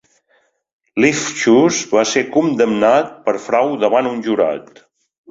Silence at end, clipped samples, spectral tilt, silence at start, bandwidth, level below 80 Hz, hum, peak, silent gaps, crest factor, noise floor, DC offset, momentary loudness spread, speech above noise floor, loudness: 0.7 s; under 0.1%; -4 dB/octave; 0.95 s; 7.8 kHz; -60 dBFS; none; -2 dBFS; none; 16 dB; -60 dBFS; under 0.1%; 7 LU; 45 dB; -15 LUFS